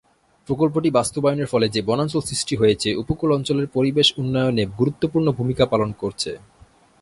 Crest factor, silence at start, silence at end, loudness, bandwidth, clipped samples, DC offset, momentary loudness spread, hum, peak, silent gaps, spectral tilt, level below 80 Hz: 18 dB; 0.5 s; 0.65 s; -21 LUFS; 11.5 kHz; under 0.1%; under 0.1%; 8 LU; none; -4 dBFS; none; -5.5 dB/octave; -48 dBFS